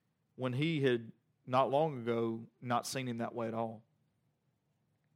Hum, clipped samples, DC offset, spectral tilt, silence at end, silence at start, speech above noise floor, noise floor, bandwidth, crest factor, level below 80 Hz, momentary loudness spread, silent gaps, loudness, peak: none; under 0.1%; under 0.1%; -6 dB/octave; 1.35 s; 0.4 s; 44 dB; -79 dBFS; 16 kHz; 20 dB; -86 dBFS; 10 LU; none; -35 LUFS; -18 dBFS